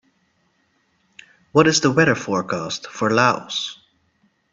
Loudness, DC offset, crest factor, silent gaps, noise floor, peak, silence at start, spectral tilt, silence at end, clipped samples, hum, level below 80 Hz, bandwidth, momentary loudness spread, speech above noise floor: -19 LUFS; under 0.1%; 22 dB; none; -65 dBFS; 0 dBFS; 1.55 s; -4 dB/octave; 0.8 s; under 0.1%; none; -60 dBFS; 8 kHz; 10 LU; 46 dB